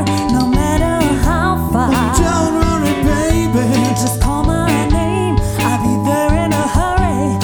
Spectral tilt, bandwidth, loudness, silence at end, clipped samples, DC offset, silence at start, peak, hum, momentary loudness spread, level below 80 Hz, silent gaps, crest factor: -5.5 dB/octave; over 20 kHz; -15 LUFS; 0 s; under 0.1%; under 0.1%; 0 s; 0 dBFS; none; 2 LU; -22 dBFS; none; 14 dB